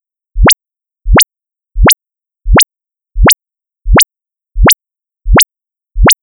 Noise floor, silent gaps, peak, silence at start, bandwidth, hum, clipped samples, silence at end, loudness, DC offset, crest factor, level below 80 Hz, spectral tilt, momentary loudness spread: -84 dBFS; none; 0 dBFS; 0.35 s; over 20 kHz; none; under 0.1%; 0.1 s; -9 LUFS; under 0.1%; 10 dB; -16 dBFS; -3 dB/octave; 21 LU